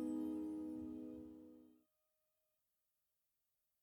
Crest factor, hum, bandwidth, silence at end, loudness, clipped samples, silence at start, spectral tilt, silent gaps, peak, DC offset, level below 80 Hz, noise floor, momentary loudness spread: 16 dB; none; 19 kHz; 2.05 s; -48 LUFS; under 0.1%; 0 s; -8 dB/octave; none; -36 dBFS; under 0.1%; -78 dBFS; -88 dBFS; 18 LU